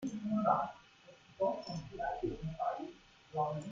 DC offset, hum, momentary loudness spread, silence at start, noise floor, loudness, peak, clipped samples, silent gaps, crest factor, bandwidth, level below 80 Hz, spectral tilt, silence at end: under 0.1%; none; 12 LU; 0 s; -61 dBFS; -38 LUFS; -18 dBFS; under 0.1%; none; 20 dB; 7.6 kHz; -62 dBFS; -7 dB/octave; 0 s